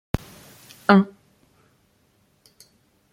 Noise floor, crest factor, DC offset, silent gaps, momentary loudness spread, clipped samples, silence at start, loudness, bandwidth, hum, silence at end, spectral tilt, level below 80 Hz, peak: -63 dBFS; 24 dB; under 0.1%; none; 28 LU; under 0.1%; 0.15 s; -21 LUFS; 15.5 kHz; none; 2.05 s; -7 dB/octave; -48 dBFS; -2 dBFS